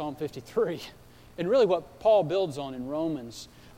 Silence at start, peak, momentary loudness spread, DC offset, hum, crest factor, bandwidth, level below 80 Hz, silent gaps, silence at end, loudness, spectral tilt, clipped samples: 0 s; -14 dBFS; 18 LU; under 0.1%; none; 16 dB; 16.5 kHz; -60 dBFS; none; 0.05 s; -28 LUFS; -6 dB/octave; under 0.1%